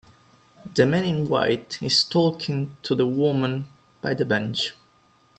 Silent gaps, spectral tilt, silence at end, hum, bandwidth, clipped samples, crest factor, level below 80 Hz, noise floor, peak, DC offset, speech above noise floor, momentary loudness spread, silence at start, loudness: none; -5.5 dB/octave; 0.65 s; none; 8.8 kHz; under 0.1%; 22 dB; -60 dBFS; -59 dBFS; -2 dBFS; under 0.1%; 37 dB; 9 LU; 0.65 s; -23 LUFS